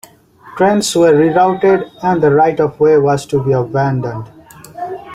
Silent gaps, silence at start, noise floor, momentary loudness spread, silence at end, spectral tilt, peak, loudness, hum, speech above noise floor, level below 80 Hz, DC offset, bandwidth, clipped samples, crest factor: none; 0.45 s; -40 dBFS; 15 LU; 0 s; -6 dB/octave; -2 dBFS; -13 LUFS; none; 28 dB; -50 dBFS; under 0.1%; 15.5 kHz; under 0.1%; 12 dB